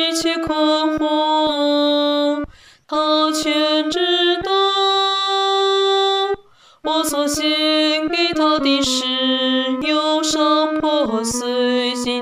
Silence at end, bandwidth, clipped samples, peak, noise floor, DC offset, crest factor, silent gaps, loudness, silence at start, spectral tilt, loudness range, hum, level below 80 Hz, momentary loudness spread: 0 s; 15.5 kHz; under 0.1%; -4 dBFS; -46 dBFS; under 0.1%; 14 dB; none; -17 LUFS; 0 s; -2 dB/octave; 1 LU; none; -50 dBFS; 4 LU